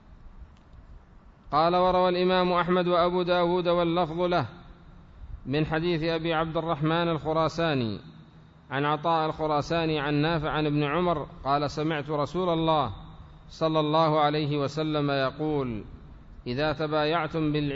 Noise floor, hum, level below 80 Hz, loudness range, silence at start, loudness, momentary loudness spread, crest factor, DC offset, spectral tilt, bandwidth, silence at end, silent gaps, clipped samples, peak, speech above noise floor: -52 dBFS; none; -48 dBFS; 4 LU; 0.1 s; -26 LUFS; 8 LU; 16 dB; under 0.1%; -7 dB/octave; 7.8 kHz; 0 s; none; under 0.1%; -10 dBFS; 27 dB